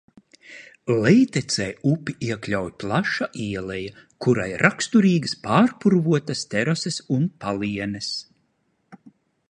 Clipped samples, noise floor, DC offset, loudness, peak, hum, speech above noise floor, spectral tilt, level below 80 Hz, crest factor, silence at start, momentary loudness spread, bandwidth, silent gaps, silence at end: under 0.1%; -69 dBFS; under 0.1%; -22 LUFS; 0 dBFS; none; 47 dB; -5.5 dB/octave; -56 dBFS; 22 dB; 0.5 s; 11 LU; 10.5 kHz; none; 0.4 s